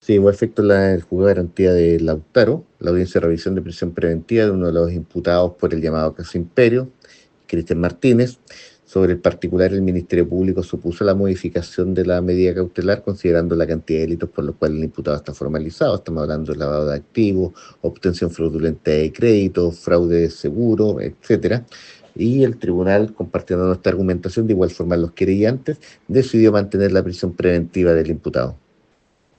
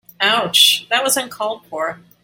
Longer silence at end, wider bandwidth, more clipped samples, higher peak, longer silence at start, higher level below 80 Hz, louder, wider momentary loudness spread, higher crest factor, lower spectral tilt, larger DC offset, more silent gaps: first, 0.8 s vs 0.3 s; second, 8.6 kHz vs 17 kHz; neither; about the same, 0 dBFS vs 0 dBFS; about the same, 0.1 s vs 0.2 s; first, -44 dBFS vs -66 dBFS; second, -18 LUFS vs -15 LUFS; second, 8 LU vs 14 LU; about the same, 18 dB vs 18 dB; first, -8 dB/octave vs -0.5 dB/octave; neither; neither